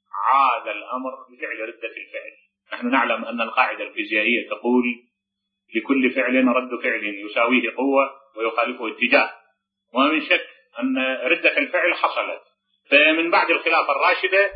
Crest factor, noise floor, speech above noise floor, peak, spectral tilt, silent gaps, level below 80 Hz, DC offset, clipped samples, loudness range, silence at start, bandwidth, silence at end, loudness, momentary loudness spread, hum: 20 dB; -81 dBFS; 60 dB; -2 dBFS; -7 dB/octave; none; -78 dBFS; under 0.1%; under 0.1%; 5 LU; 0.15 s; 5.2 kHz; 0 s; -20 LUFS; 12 LU; none